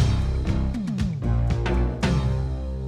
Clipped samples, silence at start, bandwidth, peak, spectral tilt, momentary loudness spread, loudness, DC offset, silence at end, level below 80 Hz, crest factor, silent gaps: under 0.1%; 0 s; 10 kHz; -10 dBFS; -7 dB/octave; 4 LU; -25 LUFS; under 0.1%; 0 s; -26 dBFS; 14 dB; none